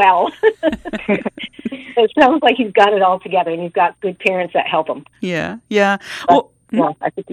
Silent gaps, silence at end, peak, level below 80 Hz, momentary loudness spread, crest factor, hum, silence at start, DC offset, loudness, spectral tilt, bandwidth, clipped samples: none; 0 s; 0 dBFS; -52 dBFS; 12 LU; 16 dB; none; 0 s; under 0.1%; -16 LUFS; -5.5 dB/octave; 11.5 kHz; under 0.1%